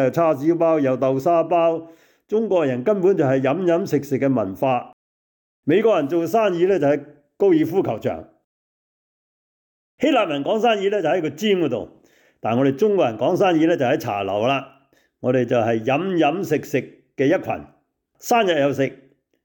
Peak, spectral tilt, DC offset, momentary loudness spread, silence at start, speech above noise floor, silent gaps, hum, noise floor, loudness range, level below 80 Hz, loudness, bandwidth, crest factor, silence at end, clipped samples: -8 dBFS; -6.5 dB/octave; under 0.1%; 8 LU; 0 s; 40 dB; 4.93-5.63 s, 8.44-9.98 s; none; -59 dBFS; 3 LU; -66 dBFS; -20 LUFS; 19.5 kHz; 12 dB; 0.5 s; under 0.1%